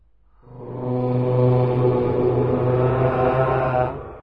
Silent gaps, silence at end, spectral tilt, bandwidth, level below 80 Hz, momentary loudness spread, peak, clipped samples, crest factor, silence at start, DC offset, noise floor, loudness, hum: none; 0 s; -11 dB/octave; 4.7 kHz; -42 dBFS; 8 LU; -6 dBFS; under 0.1%; 14 dB; 0.45 s; 0.5%; -53 dBFS; -20 LUFS; none